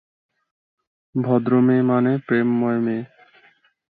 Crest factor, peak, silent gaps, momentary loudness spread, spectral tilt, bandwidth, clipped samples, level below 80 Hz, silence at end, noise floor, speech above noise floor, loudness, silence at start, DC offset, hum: 16 dB; -6 dBFS; none; 12 LU; -12 dB/octave; 4.2 kHz; under 0.1%; -66 dBFS; 0.9 s; -57 dBFS; 39 dB; -20 LUFS; 1.15 s; under 0.1%; none